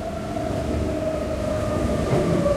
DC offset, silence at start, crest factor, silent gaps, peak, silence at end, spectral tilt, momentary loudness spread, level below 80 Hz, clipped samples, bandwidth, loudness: under 0.1%; 0 s; 14 dB; none; -8 dBFS; 0 s; -7 dB/octave; 6 LU; -34 dBFS; under 0.1%; 15.5 kHz; -24 LUFS